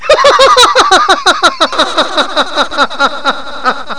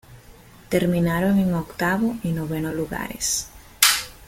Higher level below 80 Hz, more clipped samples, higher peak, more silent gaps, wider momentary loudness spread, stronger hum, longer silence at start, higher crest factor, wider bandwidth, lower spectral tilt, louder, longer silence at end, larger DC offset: first, -38 dBFS vs -46 dBFS; first, 0.3% vs under 0.1%; about the same, 0 dBFS vs 0 dBFS; neither; about the same, 10 LU vs 10 LU; neither; about the same, 0 s vs 0.1 s; second, 10 dB vs 24 dB; second, 11 kHz vs 17 kHz; second, -0.5 dB/octave vs -3.5 dB/octave; first, -8 LUFS vs -22 LUFS; about the same, 0 s vs 0.05 s; first, 5% vs under 0.1%